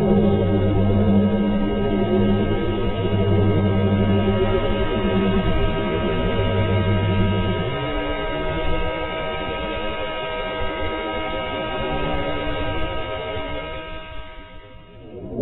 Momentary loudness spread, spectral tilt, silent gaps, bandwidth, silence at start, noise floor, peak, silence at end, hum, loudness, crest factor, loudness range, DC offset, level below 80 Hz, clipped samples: 9 LU; -10 dB/octave; none; 4.1 kHz; 0 s; -41 dBFS; -4 dBFS; 0 s; none; -22 LUFS; 16 dB; 6 LU; under 0.1%; -30 dBFS; under 0.1%